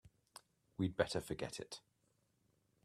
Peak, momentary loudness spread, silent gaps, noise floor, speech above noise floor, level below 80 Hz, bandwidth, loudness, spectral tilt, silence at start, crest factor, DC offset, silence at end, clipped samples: -18 dBFS; 22 LU; none; -80 dBFS; 39 dB; -68 dBFS; 14 kHz; -42 LUFS; -5 dB/octave; 0.05 s; 26 dB; under 0.1%; 1.05 s; under 0.1%